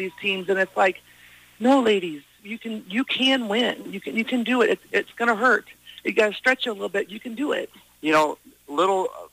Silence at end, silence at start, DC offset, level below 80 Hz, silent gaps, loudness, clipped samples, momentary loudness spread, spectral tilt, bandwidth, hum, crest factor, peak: 0.05 s; 0 s; under 0.1%; -68 dBFS; none; -23 LUFS; under 0.1%; 13 LU; -4 dB/octave; 15.5 kHz; none; 16 dB; -6 dBFS